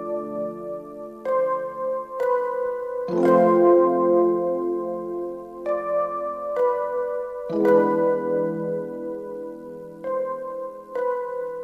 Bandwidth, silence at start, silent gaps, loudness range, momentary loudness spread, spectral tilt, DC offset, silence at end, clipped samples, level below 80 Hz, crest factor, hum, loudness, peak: 5.2 kHz; 0 s; none; 6 LU; 15 LU; -9 dB/octave; under 0.1%; 0 s; under 0.1%; -64 dBFS; 16 dB; none; -23 LUFS; -6 dBFS